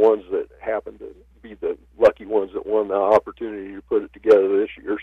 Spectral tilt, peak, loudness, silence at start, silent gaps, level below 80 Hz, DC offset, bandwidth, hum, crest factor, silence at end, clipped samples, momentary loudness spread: -6.5 dB/octave; -6 dBFS; -21 LUFS; 0 s; none; -54 dBFS; under 0.1%; 6.6 kHz; none; 16 dB; 0 s; under 0.1%; 15 LU